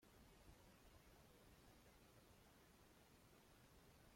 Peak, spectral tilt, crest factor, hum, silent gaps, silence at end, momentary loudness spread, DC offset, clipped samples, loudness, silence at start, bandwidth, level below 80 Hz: -52 dBFS; -4 dB/octave; 18 dB; none; none; 0 s; 1 LU; under 0.1%; under 0.1%; -69 LUFS; 0 s; 16.5 kHz; -76 dBFS